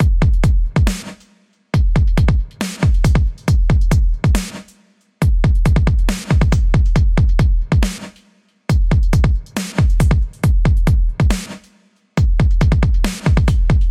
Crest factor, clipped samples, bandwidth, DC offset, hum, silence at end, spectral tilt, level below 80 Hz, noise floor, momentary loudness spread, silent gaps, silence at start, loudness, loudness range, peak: 14 dB; under 0.1%; 13.5 kHz; under 0.1%; none; 0 s; -6.5 dB/octave; -16 dBFS; -54 dBFS; 7 LU; none; 0 s; -16 LUFS; 1 LU; 0 dBFS